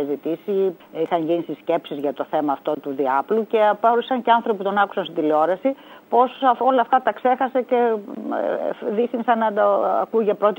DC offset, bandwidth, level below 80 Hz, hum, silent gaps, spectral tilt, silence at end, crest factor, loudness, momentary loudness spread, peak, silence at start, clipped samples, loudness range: under 0.1%; 16 kHz; -76 dBFS; none; none; -7.5 dB/octave; 0.05 s; 18 dB; -21 LUFS; 7 LU; -2 dBFS; 0 s; under 0.1%; 3 LU